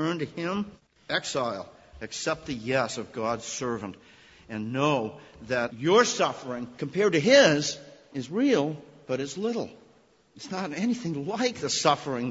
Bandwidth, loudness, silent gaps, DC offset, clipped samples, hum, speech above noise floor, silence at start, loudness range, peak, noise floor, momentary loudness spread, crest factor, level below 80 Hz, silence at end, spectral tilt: 8 kHz; -27 LUFS; none; under 0.1%; under 0.1%; none; 33 dB; 0 s; 7 LU; -6 dBFS; -60 dBFS; 17 LU; 22 dB; -62 dBFS; 0 s; -4 dB/octave